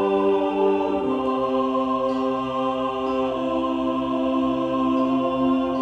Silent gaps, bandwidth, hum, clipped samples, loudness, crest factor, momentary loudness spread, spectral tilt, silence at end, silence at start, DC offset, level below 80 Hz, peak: none; 7.6 kHz; none; under 0.1%; -23 LUFS; 12 dB; 3 LU; -7 dB/octave; 0 s; 0 s; under 0.1%; -52 dBFS; -10 dBFS